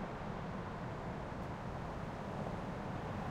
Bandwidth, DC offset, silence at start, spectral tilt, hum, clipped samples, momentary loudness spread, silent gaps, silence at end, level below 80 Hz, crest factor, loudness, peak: 15.5 kHz; under 0.1%; 0 s; -7 dB/octave; none; under 0.1%; 2 LU; none; 0 s; -54 dBFS; 14 dB; -44 LUFS; -28 dBFS